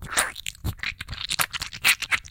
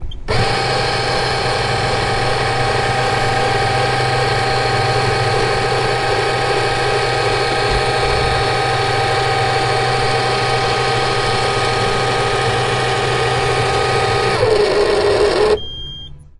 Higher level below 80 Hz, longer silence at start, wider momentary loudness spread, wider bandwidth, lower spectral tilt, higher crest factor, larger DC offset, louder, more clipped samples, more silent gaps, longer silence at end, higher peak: second, -44 dBFS vs -32 dBFS; about the same, 0 s vs 0 s; first, 12 LU vs 2 LU; first, 17 kHz vs 11.5 kHz; second, -0.5 dB/octave vs -4 dB/octave; first, 24 dB vs 14 dB; neither; second, -25 LUFS vs -16 LUFS; neither; neither; second, 0 s vs 0.15 s; about the same, -4 dBFS vs -2 dBFS